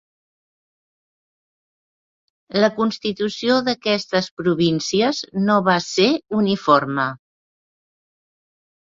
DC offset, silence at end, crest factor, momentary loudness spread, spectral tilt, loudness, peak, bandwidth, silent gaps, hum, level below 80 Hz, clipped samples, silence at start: under 0.1%; 1.65 s; 20 dB; 6 LU; -5 dB/octave; -19 LUFS; -2 dBFS; 7.8 kHz; 4.31-4.37 s; none; -62 dBFS; under 0.1%; 2.5 s